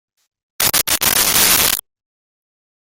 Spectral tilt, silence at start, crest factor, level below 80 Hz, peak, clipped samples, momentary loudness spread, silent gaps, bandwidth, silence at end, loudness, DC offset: 0 dB/octave; 0.6 s; 18 dB; -44 dBFS; 0 dBFS; under 0.1%; 6 LU; none; over 20 kHz; 1.1 s; -13 LUFS; under 0.1%